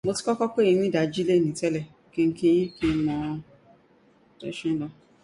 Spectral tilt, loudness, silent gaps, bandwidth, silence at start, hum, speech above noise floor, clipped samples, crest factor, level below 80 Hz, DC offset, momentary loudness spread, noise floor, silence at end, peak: -6 dB/octave; -25 LUFS; none; 11.5 kHz; 0.05 s; none; 35 dB; under 0.1%; 14 dB; -54 dBFS; under 0.1%; 13 LU; -59 dBFS; 0.3 s; -12 dBFS